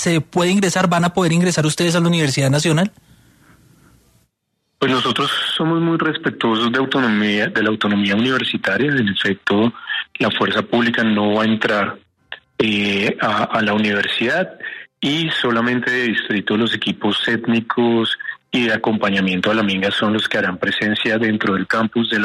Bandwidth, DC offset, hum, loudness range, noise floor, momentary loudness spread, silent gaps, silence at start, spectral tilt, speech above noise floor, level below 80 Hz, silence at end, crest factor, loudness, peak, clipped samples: 13.5 kHz; under 0.1%; none; 3 LU; -71 dBFS; 4 LU; none; 0 s; -4.5 dB/octave; 54 dB; -58 dBFS; 0 s; 16 dB; -17 LUFS; -2 dBFS; under 0.1%